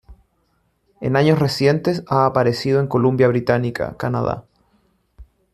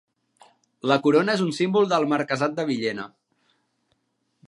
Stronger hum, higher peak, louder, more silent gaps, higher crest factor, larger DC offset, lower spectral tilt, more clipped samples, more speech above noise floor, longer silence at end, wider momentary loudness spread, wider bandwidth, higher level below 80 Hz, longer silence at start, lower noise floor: neither; about the same, -2 dBFS vs -4 dBFS; first, -18 LUFS vs -23 LUFS; neither; second, 16 dB vs 22 dB; neither; first, -7 dB/octave vs -5.5 dB/octave; neither; second, 47 dB vs 51 dB; second, 0.3 s vs 1.45 s; about the same, 9 LU vs 11 LU; first, 14 kHz vs 11.5 kHz; first, -50 dBFS vs -74 dBFS; second, 0.1 s vs 0.85 s; second, -65 dBFS vs -73 dBFS